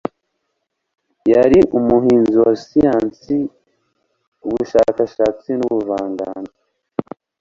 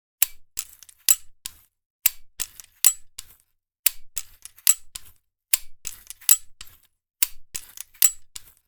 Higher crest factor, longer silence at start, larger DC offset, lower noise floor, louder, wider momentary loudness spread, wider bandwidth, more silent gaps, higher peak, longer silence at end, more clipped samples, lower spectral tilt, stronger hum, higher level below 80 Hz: second, 16 dB vs 28 dB; first, 1.25 s vs 0.2 s; neither; first, -74 dBFS vs -67 dBFS; first, -16 LUFS vs -22 LUFS; second, 16 LU vs 21 LU; second, 7.4 kHz vs over 20 kHz; second, 4.28-4.32 s vs 1.86-1.99 s, 3.79-3.83 s; about the same, -2 dBFS vs 0 dBFS; about the same, 0.4 s vs 0.3 s; neither; first, -8 dB/octave vs 3.5 dB/octave; neither; first, -46 dBFS vs -54 dBFS